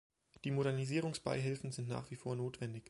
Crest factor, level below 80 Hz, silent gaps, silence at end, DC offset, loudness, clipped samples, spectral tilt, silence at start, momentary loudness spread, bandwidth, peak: 18 dB; -70 dBFS; none; 0.1 s; under 0.1%; -40 LUFS; under 0.1%; -6 dB/octave; 0.45 s; 7 LU; 11.5 kHz; -22 dBFS